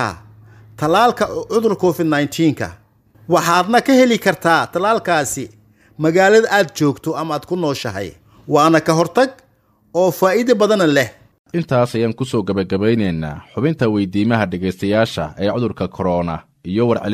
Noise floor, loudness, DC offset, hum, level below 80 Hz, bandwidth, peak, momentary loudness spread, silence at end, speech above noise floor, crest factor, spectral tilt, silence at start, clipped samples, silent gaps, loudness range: -57 dBFS; -17 LUFS; under 0.1%; none; -50 dBFS; 16 kHz; 0 dBFS; 11 LU; 0 s; 41 dB; 16 dB; -5.5 dB/octave; 0 s; under 0.1%; 11.39-11.45 s; 3 LU